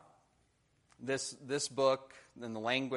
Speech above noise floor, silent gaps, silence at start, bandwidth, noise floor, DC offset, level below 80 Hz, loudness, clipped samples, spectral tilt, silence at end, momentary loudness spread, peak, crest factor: 38 dB; none; 1 s; 11.5 kHz; -74 dBFS; under 0.1%; -78 dBFS; -35 LUFS; under 0.1%; -3 dB/octave; 0 s; 16 LU; -16 dBFS; 22 dB